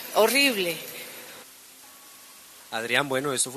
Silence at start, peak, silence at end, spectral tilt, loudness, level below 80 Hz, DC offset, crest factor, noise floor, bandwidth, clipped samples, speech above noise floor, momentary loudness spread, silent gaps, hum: 0 s; -6 dBFS; 0 s; -2 dB/octave; -24 LUFS; -76 dBFS; under 0.1%; 22 dB; -49 dBFS; 14 kHz; under 0.1%; 25 dB; 26 LU; none; none